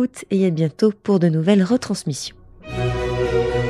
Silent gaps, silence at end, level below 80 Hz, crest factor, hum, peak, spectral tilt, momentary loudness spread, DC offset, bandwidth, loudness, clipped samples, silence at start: none; 0 s; -38 dBFS; 16 dB; none; -4 dBFS; -6.5 dB/octave; 10 LU; under 0.1%; 12.5 kHz; -20 LUFS; under 0.1%; 0 s